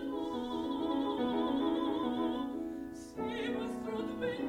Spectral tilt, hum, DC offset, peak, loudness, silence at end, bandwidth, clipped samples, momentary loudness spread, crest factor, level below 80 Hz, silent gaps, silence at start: -6 dB/octave; none; under 0.1%; -22 dBFS; -36 LUFS; 0 s; 15.5 kHz; under 0.1%; 8 LU; 14 dB; -62 dBFS; none; 0 s